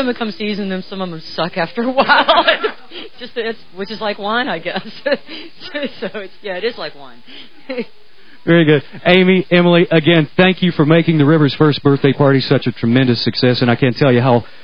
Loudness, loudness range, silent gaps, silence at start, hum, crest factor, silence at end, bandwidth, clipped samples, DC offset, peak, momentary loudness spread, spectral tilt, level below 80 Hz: -14 LUFS; 11 LU; none; 0 s; none; 16 dB; 0.2 s; 6.2 kHz; under 0.1%; 2%; 0 dBFS; 15 LU; -8.5 dB/octave; -52 dBFS